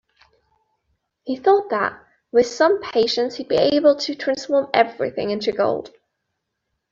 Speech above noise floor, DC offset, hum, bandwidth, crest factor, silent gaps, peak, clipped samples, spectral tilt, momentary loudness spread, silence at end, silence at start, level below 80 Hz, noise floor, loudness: 58 dB; under 0.1%; none; 7.6 kHz; 18 dB; none; -4 dBFS; under 0.1%; -4 dB/octave; 8 LU; 1.05 s; 1.25 s; -62 dBFS; -77 dBFS; -20 LUFS